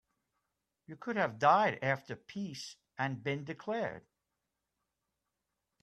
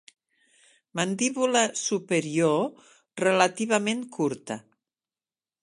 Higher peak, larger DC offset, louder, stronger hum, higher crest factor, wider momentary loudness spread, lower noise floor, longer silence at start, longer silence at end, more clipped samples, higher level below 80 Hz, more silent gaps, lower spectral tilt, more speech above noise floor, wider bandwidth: second, -14 dBFS vs -6 dBFS; neither; second, -34 LUFS vs -26 LUFS; neither; about the same, 24 dB vs 22 dB; first, 18 LU vs 13 LU; about the same, -87 dBFS vs under -90 dBFS; about the same, 0.9 s vs 0.95 s; first, 1.85 s vs 1.05 s; neither; about the same, -78 dBFS vs -76 dBFS; neither; first, -5.5 dB/octave vs -3.5 dB/octave; second, 53 dB vs over 65 dB; first, 13 kHz vs 11.5 kHz